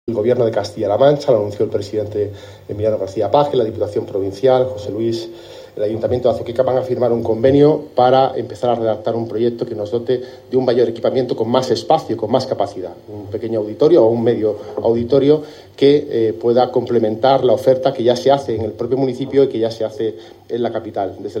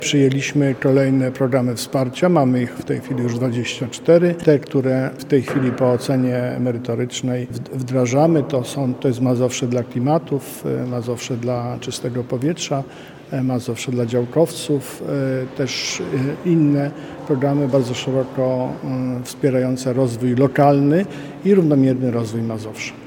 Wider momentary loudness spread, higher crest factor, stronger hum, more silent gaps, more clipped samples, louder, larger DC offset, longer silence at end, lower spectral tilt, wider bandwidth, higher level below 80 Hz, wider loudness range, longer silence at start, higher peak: about the same, 10 LU vs 9 LU; about the same, 16 dB vs 18 dB; neither; neither; neither; about the same, -17 LUFS vs -19 LUFS; neither; about the same, 0 s vs 0 s; about the same, -7 dB/octave vs -6.5 dB/octave; second, 10.5 kHz vs 18 kHz; about the same, -58 dBFS vs -58 dBFS; about the same, 4 LU vs 5 LU; about the same, 0.05 s vs 0 s; about the same, 0 dBFS vs 0 dBFS